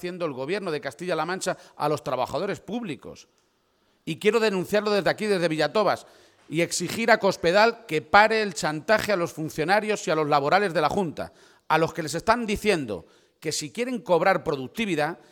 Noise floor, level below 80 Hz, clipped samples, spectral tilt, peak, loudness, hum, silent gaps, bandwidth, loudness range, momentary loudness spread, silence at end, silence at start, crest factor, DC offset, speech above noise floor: -67 dBFS; -58 dBFS; under 0.1%; -4 dB/octave; -2 dBFS; -24 LUFS; none; none; 18.5 kHz; 7 LU; 11 LU; 0.15 s; 0 s; 22 dB; under 0.1%; 43 dB